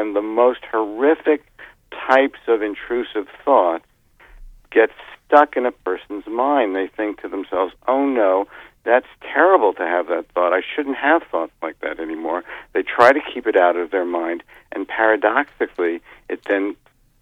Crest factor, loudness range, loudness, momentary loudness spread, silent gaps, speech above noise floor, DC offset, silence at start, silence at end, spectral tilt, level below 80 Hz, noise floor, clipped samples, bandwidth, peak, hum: 20 dB; 3 LU; -19 LUFS; 13 LU; none; 30 dB; under 0.1%; 0 s; 0.45 s; -5 dB/octave; -54 dBFS; -48 dBFS; under 0.1%; 9.4 kHz; 0 dBFS; none